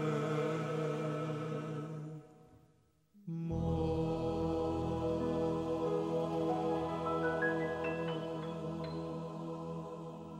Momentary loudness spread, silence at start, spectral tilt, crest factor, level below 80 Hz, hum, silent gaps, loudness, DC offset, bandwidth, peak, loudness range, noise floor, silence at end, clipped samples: 9 LU; 0 s; -7.5 dB/octave; 14 dB; -56 dBFS; none; none; -37 LUFS; under 0.1%; 11 kHz; -22 dBFS; 5 LU; -70 dBFS; 0 s; under 0.1%